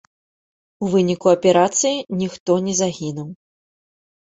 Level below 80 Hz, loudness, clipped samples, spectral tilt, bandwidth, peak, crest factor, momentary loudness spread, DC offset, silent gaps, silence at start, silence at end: -60 dBFS; -19 LUFS; under 0.1%; -4.5 dB/octave; 8 kHz; -2 dBFS; 18 dB; 13 LU; under 0.1%; 2.40-2.46 s; 0.8 s; 0.9 s